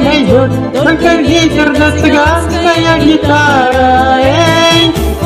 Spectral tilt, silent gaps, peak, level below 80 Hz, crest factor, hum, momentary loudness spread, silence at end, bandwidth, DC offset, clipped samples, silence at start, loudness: -5 dB/octave; none; 0 dBFS; -24 dBFS; 8 dB; none; 3 LU; 0 s; 15.5 kHz; under 0.1%; 0.7%; 0 s; -8 LUFS